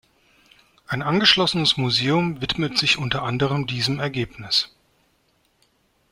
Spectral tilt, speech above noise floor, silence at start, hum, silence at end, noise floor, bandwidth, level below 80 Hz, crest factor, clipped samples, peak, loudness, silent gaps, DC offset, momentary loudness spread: -4.5 dB/octave; 43 dB; 0.9 s; none; 1.45 s; -65 dBFS; 16 kHz; -52 dBFS; 22 dB; under 0.1%; -2 dBFS; -20 LUFS; none; under 0.1%; 11 LU